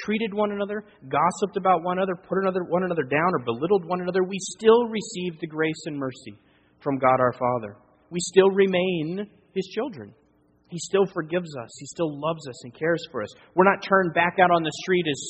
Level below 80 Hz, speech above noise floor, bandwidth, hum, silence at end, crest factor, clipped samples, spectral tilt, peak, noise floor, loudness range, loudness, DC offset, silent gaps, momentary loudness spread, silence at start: -64 dBFS; 38 dB; 8.8 kHz; none; 0 s; 22 dB; under 0.1%; -5 dB/octave; -2 dBFS; -62 dBFS; 5 LU; -24 LUFS; under 0.1%; none; 14 LU; 0 s